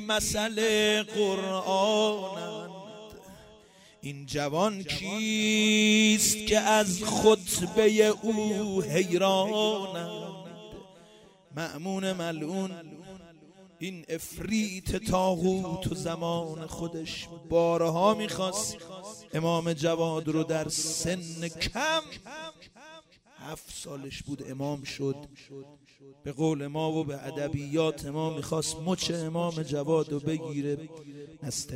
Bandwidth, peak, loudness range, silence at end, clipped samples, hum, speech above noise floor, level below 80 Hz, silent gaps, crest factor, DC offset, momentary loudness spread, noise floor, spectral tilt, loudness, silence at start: 16 kHz; -8 dBFS; 12 LU; 0 s; under 0.1%; none; 27 dB; -54 dBFS; none; 20 dB; under 0.1%; 19 LU; -56 dBFS; -4 dB/octave; -28 LUFS; 0 s